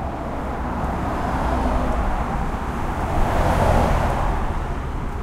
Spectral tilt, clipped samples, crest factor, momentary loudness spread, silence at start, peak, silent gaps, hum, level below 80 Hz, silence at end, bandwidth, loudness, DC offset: -7 dB/octave; under 0.1%; 16 dB; 9 LU; 0 s; -4 dBFS; none; none; -24 dBFS; 0 s; 15.5 kHz; -23 LUFS; under 0.1%